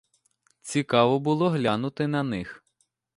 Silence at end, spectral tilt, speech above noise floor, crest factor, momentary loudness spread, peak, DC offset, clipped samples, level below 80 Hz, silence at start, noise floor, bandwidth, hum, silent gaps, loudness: 0.6 s; -6 dB/octave; 48 dB; 20 dB; 12 LU; -6 dBFS; under 0.1%; under 0.1%; -62 dBFS; 0.65 s; -72 dBFS; 11.5 kHz; none; none; -25 LUFS